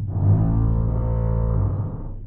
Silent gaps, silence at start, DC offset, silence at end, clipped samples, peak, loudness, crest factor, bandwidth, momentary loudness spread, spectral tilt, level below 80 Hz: none; 0 s; under 0.1%; 0 s; under 0.1%; -8 dBFS; -22 LUFS; 12 dB; 2.1 kHz; 6 LU; -14.5 dB/octave; -26 dBFS